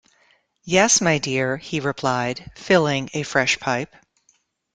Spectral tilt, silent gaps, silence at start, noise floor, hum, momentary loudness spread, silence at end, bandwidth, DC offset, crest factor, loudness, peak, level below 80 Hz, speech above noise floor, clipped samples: -3 dB/octave; none; 0.65 s; -64 dBFS; none; 10 LU; 0.9 s; 10.5 kHz; under 0.1%; 20 dB; -20 LUFS; -2 dBFS; -56 dBFS; 43 dB; under 0.1%